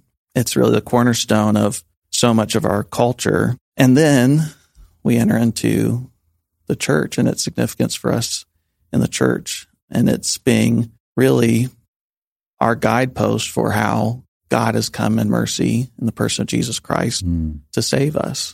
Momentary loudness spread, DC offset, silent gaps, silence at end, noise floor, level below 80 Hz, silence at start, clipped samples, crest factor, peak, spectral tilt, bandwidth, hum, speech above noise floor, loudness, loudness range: 8 LU; under 0.1%; 1.97-2.02 s, 3.61-3.72 s, 9.82-9.88 s, 11.00-11.15 s, 11.88-12.10 s, 12.17-12.40 s, 12.46-12.57 s, 14.28-14.41 s; 0 s; -66 dBFS; -44 dBFS; 0.35 s; under 0.1%; 18 dB; 0 dBFS; -5 dB/octave; 16 kHz; none; 49 dB; -18 LUFS; 4 LU